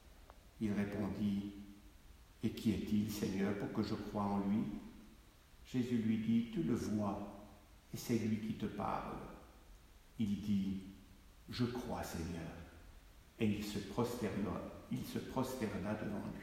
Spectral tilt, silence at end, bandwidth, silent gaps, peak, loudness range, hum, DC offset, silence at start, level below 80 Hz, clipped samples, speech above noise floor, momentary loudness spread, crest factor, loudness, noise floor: -6.5 dB/octave; 0 s; 16 kHz; none; -24 dBFS; 4 LU; none; under 0.1%; 0.05 s; -60 dBFS; under 0.1%; 23 dB; 18 LU; 18 dB; -40 LUFS; -62 dBFS